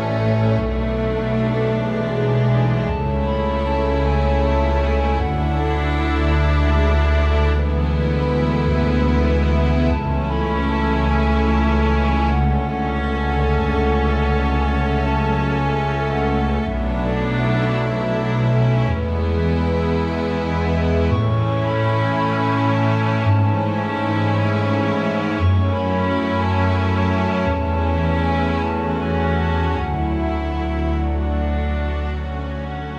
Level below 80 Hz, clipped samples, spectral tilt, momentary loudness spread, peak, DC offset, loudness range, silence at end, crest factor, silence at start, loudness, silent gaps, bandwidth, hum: -24 dBFS; under 0.1%; -8.5 dB/octave; 4 LU; -4 dBFS; under 0.1%; 2 LU; 0 s; 14 dB; 0 s; -19 LUFS; none; 7 kHz; none